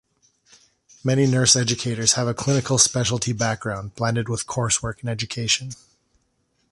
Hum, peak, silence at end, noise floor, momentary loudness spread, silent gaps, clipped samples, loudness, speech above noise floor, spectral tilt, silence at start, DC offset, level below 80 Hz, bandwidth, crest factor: none; -2 dBFS; 0.95 s; -69 dBFS; 11 LU; none; under 0.1%; -21 LUFS; 47 dB; -3.5 dB/octave; 1.05 s; under 0.1%; -50 dBFS; 11.5 kHz; 22 dB